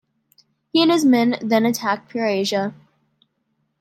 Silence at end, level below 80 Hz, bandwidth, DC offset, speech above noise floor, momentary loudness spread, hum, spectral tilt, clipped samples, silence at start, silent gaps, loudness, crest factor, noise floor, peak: 1.05 s; -72 dBFS; 16.5 kHz; under 0.1%; 52 dB; 8 LU; none; -4.5 dB/octave; under 0.1%; 0.75 s; none; -19 LUFS; 16 dB; -71 dBFS; -4 dBFS